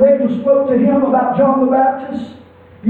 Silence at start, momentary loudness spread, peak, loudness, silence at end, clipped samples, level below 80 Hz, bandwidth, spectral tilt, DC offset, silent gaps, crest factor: 0 s; 13 LU; -2 dBFS; -13 LUFS; 0 s; under 0.1%; -54 dBFS; 4.3 kHz; -10 dB/octave; under 0.1%; none; 12 dB